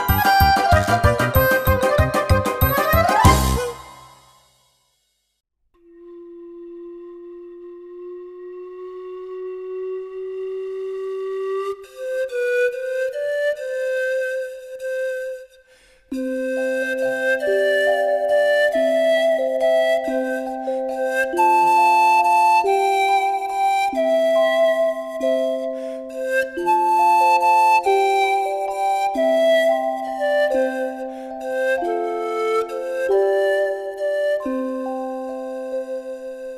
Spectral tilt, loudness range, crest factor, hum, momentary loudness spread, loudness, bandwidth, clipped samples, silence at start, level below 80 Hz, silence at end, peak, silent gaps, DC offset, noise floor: -5 dB/octave; 14 LU; 20 dB; none; 17 LU; -19 LUFS; 15.5 kHz; under 0.1%; 0 s; -36 dBFS; 0 s; 0 dBFS; none; under 0.1%; -69 dBFS